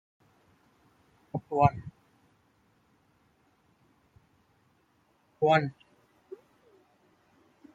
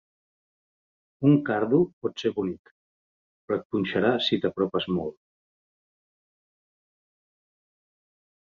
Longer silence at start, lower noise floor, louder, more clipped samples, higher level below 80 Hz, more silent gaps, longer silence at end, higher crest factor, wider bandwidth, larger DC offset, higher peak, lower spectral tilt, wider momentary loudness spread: first, 1.35 s vs 1.2 s; second, -69 dBFS vs under -90 dBFS; about the same, -28 LUFS vs -26 LUFS; neither; about the same, -62 dBFS vs -64 dBFS; second, none vs 1.93-2.01 s, 2.59-2.65 s, 2.71-3.48 s, 3.65-3.70 s; second, 2.05 s vs 3.35 s; first, 28 dB vs 20 dB; about the same, 7.8 kHz vs 7.2 kHz; neither; about the same, -8 dBFS vs -8 dBFS; about the same, -7.5 dB/octave vs -7.5 dB/octave; first, 26 LU vs 9 LU